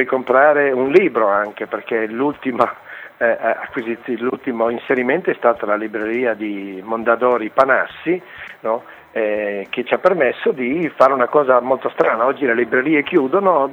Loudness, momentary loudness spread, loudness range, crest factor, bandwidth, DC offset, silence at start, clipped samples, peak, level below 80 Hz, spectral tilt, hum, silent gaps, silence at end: -17 LUFS; 10 LU; 4 LU; 18 dB; 6.8 kHz; under 0.1%; 0 s; under 0.1%; 0 dBFS; -62 dBFS; -7.5 dB/octave; none; none; 0 s